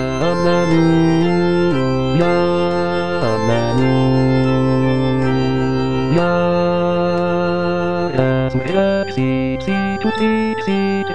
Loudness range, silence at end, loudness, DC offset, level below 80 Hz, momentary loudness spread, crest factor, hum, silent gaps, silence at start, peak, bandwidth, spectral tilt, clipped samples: 2 LU; 0 s; -16 LUFS; 3%; -40 dBFS; 4 LU; 14 dB; none; none; 0 s; -2 dBFS; 10 kHz; -7.5 dB/octave; under 0.1%